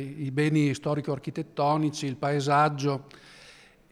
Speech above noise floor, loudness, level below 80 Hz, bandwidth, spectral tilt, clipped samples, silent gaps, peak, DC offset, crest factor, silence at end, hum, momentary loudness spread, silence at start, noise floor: 27 dB; -27 LUFS; -66 dBFS; 12 kHz; -6.5 dB/octave; under 0.1%; none; -10 dBFS; under 0.1%; 18 dB; 0.4 s; none; 9 LU; 0 s; -53 dBFS